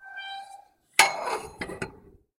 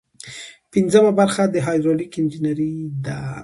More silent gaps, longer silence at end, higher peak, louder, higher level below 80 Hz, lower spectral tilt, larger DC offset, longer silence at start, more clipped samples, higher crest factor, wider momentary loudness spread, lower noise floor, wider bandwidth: neither; first, 0.3 s vs 0 s; about the same, 0 dBFS vs -2 dBFS; second, -25 LUFS vs -19 LUFS; about the same, -60 dBFS vs -56 dBFS; second, -0.5 dB/octave vs -6.5 dB/octave; neither; second, 0 s vs 0.25 s; neither; first, 30 dB vs 18 dB; about the same, 19 LU vs 20 LU; first, -52 dBFS vs -39 dBFS; first, 16 kHz vs 11.5 kHz